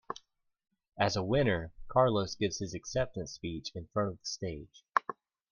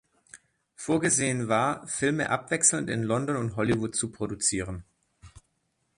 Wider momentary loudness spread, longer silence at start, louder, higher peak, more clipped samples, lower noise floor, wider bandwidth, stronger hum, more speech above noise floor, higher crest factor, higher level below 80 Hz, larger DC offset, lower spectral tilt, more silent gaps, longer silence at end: first, 14 LU vs 10 LU; second, 0.1 s vs 0.35 s; second, -33 LUFS vs -26 LUFS; about the same, -8 dBFS vs -6 dBFS; neither; second, -69 dBFS vs -75 dBFS; second, 10 kHz vs 11.5 kHz; neither; second, 37 dB vs 48 dB; about the same, 26 dB vs 24 dB; about the same, -56 dBFS vs -56 dBFS; neither; about the same, -5 dB/octave vs -4 dB/octave; neither; second, 0.4 s vs 0.6 s